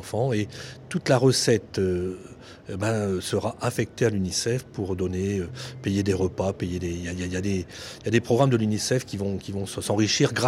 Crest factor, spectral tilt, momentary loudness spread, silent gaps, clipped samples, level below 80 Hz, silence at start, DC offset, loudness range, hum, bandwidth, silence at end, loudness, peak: 18 dB; -5 dB/octave; 11 LU; none; under 0.1%; -52 dBFS; 0 s; under 0.1%; 3 LU; none; 16 kHz; 0 s; -26 LUFS; -8 dBFS